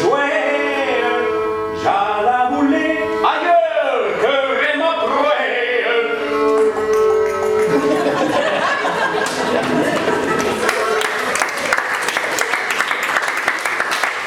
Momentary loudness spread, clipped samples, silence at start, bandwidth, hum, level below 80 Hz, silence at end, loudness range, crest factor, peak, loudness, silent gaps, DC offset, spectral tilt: 3 LU; under 0.1%; 0 s; 18 kHz; none; -54 dBFS; 0 s; 1 LU; 16 dB; 0 dBFS; -17 LUFS; none; under 0.1%; -3 dB/octave